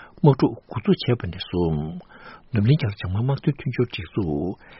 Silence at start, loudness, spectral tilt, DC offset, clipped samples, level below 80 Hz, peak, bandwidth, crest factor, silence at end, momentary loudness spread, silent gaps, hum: 0 s; -23 LUFS; -7 dB/octave; under 0.1%; under 0.1%; -46 dBFS; -2 dBFS; 5.8 kHz; 20 dB; 0 s; 8 LU; none; none